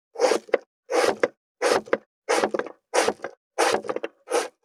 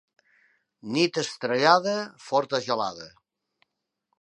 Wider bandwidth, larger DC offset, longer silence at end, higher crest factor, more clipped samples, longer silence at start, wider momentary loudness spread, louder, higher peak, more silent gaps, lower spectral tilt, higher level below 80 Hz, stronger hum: first, 15 kHz vs 11 kHz; neither; second, 0.15 s vs 1.1 s; about the same, 20 dB vs 24 dB; neither; second, 0.15 s vs 0.85 s; second, 8 LU vs 18 LU; about the same, -25 LUFS vs -25 LUFS; about the same, -4 dBFS vs -4 dBFS; first, 0.66-0.83 s, 1.37-1.55 s, 2.06-2.22 s, 3.37-3.51 s vs none; second, -2 dB/octave vs -4 dB/octave; about the same, -72 dBFS vs -76 dBFS; neither